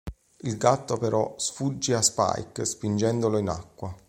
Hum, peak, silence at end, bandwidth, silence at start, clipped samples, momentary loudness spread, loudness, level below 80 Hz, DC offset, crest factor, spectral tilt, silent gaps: none; -6 dBFS; 0.1 s; 16.5 kHz; 0.05 s; under 0.1%; 12 LU; -26 LUFS; -50 dBFS; under 0.1%; 22 dB; -4.5 dB/octave; none